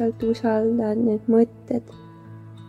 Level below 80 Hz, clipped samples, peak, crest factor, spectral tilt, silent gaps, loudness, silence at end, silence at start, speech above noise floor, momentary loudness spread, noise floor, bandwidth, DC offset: -56 dBFS; under 0.1%; -8 dBFS; 16 dB; -8.5 dB/octave; none; -22 LUFS; 0.05 s; 0 s; 20 dB; 23 LU; -42 dBFS; 7.4 kHz; under 0.1%